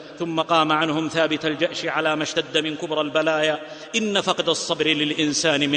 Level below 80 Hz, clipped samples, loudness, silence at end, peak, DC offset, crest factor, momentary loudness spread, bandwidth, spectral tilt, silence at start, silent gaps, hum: -64 dBFS; under 0.1%; -22 LUFS; 0 s; -4 dBFS; under 0.1%; 18 dB; 6 LU; 10 kHz; -3 dB/octave; 0 s; none; none